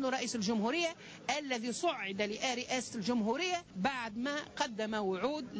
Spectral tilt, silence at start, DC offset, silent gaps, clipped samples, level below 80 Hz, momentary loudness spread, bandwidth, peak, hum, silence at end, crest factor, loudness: -3.5 dB/octave; 0 s; under 0.1%; none; under 0.1%; -70 dBFS; 4 LU; 8 kHz; -22 dBFS; none; 0 s; 14 dB; -35 LUFS